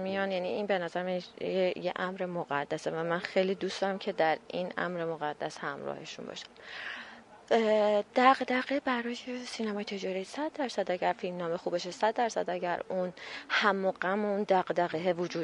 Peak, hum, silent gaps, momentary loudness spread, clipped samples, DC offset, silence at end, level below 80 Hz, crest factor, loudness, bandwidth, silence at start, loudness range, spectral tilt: -8 dBFS; none; none; 12 LU; under 0.1%; under 0.1%; 0 s; -76 dBFS; 24 dB; -31 LUFS; 11 kHz; 0 s; 5 LU; -5 dB/octave